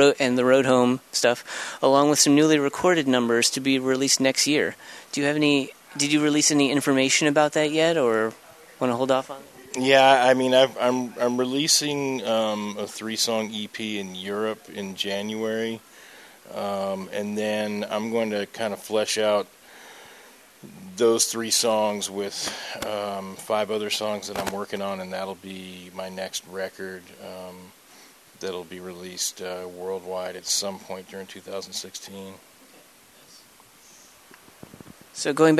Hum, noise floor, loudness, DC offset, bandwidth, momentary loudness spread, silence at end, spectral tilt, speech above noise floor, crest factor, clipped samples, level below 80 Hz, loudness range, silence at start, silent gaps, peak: none; -53 dBFS; -23 LUFS; under 0.1%; 14 kHz; 18 LU; 0 s; -3 dB/octave; 29 dB; 22 dB; under 0.1%; -68 dBFS; 14 LU; 0 s; none; -4 dBFS